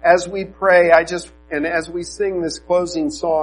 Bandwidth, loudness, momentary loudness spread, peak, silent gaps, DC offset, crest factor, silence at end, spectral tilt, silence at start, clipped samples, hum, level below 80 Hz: 10.5 kHz; -18 LUFS; 14 LU; 0 dBFS; none; under 0.1%; 18 dB; 0 s; -4 dB/octave; 0.05 s; under 0.1%; none; -46 dBFS